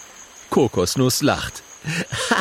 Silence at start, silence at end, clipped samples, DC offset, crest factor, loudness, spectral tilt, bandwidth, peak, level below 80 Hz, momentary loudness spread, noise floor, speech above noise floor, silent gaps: 0 s; 0 s; under 0.1%; under 0.1%; 18 dB; -21 LUFS; -4 dB/octave; 16.5 kHz; -4 dBFS; -48 dBFS; 15 LU; -43 dBFS; 23 dB; none